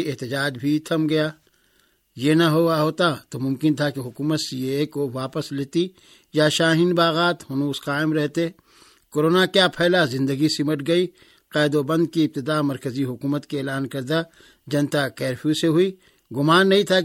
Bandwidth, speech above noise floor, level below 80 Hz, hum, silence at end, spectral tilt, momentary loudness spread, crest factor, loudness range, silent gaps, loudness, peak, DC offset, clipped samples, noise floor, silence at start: 16.5 kHz; 42 dB; -64 dBFS; none; 0 s; -5.5 dB/octave; 10 LU; 18 dB; 4 LU; none; -22 LUFS; -4 dBFS; under 0.1%; under 0.1%; -63 dBFS; 0 s